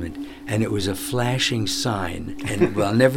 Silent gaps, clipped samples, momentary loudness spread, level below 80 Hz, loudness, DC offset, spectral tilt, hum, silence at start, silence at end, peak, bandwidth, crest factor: none; under 0.1%; 10 LU; -44 dBFS; -23 LUFS; under 0.1%; -5 dB/octave; none; 0 s; 0 s; -4 dBFS; 18 kHz; 18 dB